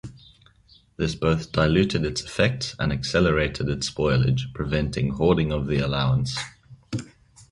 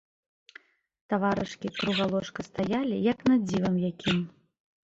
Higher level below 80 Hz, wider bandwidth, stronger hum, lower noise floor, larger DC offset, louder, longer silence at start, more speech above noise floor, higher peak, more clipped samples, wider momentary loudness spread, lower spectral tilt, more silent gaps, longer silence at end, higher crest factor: first, -38 dBFS vs -60 dBFS; first, 11.5 kHz vs 8 kHz; neither; about the same, -57 dBFS vs -56 dBFS; neither; first, -24 LUFS vs -28 LUFS; second, 0.05 s vs 1.1 s; first, 34 dB vs 28 dB; first, -6 dBFS vs -14 dBFS; neither; about the same, 10 LU vs 8 LU; about the same, -6 dB/octave vs -6.5 dB/octave; neither; second, 0.1 s vs 0.55 s; about the same, 18 dB vs 16 dB